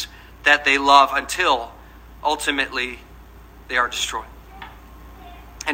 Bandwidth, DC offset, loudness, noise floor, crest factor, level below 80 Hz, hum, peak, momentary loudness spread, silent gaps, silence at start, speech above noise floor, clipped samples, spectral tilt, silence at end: 16 kHz; under 0.1%; -19 LUFS; -43 dBFS; 22 dB; -44 dBFS; none; 0 dBFS; 25 LU; none; 0 s; 24 dB; under 0.1%; -1.5 dB/octave; 0 s